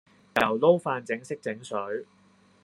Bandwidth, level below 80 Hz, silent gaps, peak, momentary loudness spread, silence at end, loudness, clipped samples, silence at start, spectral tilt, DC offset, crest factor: 12.5 kHz; -70 dBFS; none; -4 dBFS; 12 LU; 0.6 s; -27 LUFS; under 0.1%; 0.35 s; -5.5 dB/octave; under 0.1%; 24 dB